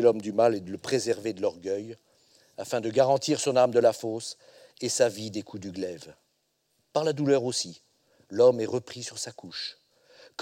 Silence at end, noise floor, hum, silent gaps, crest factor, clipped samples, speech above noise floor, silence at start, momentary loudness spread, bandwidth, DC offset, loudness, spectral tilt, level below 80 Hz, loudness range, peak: 0 s; -74 dBFS; none; none; 20 dB; under 0.1%; 47 dB; 0 s; 15 LU; 16 kHz; under 0.1%; -27 LUFS; -4.5 dB/octave; -74 dBFS; 5 LU; -8 dBFS